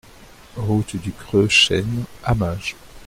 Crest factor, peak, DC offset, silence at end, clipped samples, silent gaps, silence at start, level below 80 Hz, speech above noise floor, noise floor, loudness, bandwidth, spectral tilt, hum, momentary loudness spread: 18 dB; -2 dBFS; under 0.1%; 0 s; under 0.1%; none; 0.2 s; -40 dBFS; 25 dB; -45 dBFS; -20 LUFS; 16 kHz; -4.5 dB/octave; none; 16 LU